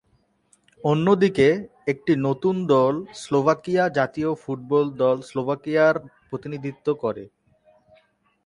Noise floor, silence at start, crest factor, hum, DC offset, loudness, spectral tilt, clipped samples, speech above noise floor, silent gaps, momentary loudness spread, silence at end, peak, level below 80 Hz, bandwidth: -65 dBFS; 0.85 s; 18 dB; none; under 0.1%; -22 LUFS; -7 dB/octave; under 0.1%; 43 dB; none; 11 LU; 1.2 s; -4 dBFS; -60 dBFS; 11 kHz